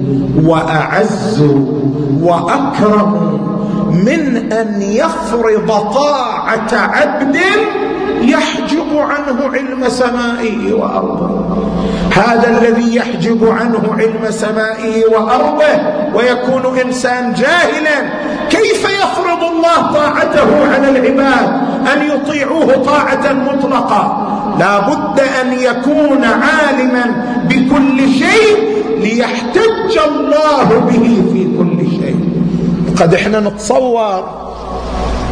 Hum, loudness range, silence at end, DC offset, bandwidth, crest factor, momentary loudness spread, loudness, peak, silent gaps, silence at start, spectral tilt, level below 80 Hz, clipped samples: none; 2 LU; 0 s; under 0.1%; 10.5 kHz; 12 dB; 6 LU; -11 LUFS; 0 dBFS; none; 0 s; -6 dB/octave; -36 dBFS; under 0.1%